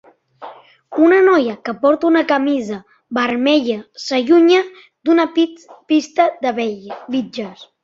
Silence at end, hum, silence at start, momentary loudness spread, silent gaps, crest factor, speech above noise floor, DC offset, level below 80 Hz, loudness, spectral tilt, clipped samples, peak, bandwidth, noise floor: 0.2 s; none; 0.4 s; 16 LU; none; 14 dB; 22 dB; under 0.1%; -64 dBFS; -16 LUFS; -4.5 dB/octave; under 0.1%; -2 dBFS; 7.6 kHz; -38 dBFS